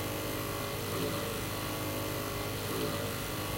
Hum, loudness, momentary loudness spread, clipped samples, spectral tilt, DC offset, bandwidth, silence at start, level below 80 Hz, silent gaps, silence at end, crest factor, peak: none; -35 LUFS; 2 LU; under 0.1%; -4 dB/octave; under 0.1%; 16 kHz; 0 s; -50 dBFS; none; 0 s; 14 dB; -22 dBFS